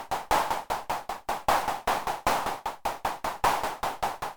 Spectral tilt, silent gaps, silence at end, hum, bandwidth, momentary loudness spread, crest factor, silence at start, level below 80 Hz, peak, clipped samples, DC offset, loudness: -2.5 dB/octave; none; 0 s; none; over 20 kHz; 6 LU; 20 dB; 0 s; -48 dBFS; -10 dBFS; under 0.1%; under 0.1%; -29 LUFS